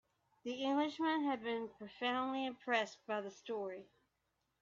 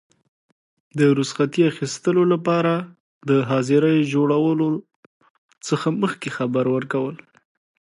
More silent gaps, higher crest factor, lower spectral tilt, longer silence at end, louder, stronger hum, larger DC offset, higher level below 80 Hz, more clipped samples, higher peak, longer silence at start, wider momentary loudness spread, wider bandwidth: second, none vs 3.00-3.21 s, 4.96-5.21 s, 5.30-5.49 s; about the same, 18 dB vs 16 dB; second, -1.5 dB/octave vs -6.5 dB/octave; about the same, 0.8 s vs 0.75 s; second, -39 LUFS vs -20 LUFS; neither; neither; second, -84 dBFS vs -70 dBFS; neither; second, -22 dBFS vs -6 dBFS; second, 0.45 s vs 0.95 s; about the same, 10 LU vs 9 LU; second, 7.4 kHz vs 11 kHz